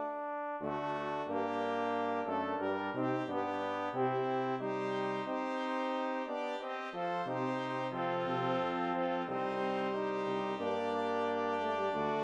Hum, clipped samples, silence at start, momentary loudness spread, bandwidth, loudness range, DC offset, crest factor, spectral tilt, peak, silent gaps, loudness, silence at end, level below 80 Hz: none; under 0.1%; 0 s; 3 LU; 9.4 kHz; 2 LU; under 0.1%; 14 dB; -6.5 dB/octave; -22 dBFS; none; -36 LUFS; 0 s; -78 dBFS